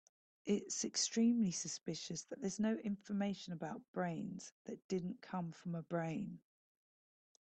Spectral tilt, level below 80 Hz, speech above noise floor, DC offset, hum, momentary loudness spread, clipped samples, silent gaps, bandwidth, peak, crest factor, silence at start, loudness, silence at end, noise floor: -4.5 dB/octave; -80 dBFS; over 50 dB; under 0.1%; none; 13 LU; under 0.1%; 3.88-3.94 s, 4.52-4.65 s, 4.84-4.89 s; 9 kHz; -24 dBFS; 16 dB; 0.45 s; -41 LUFS; 1.1 s; under -90 dBFS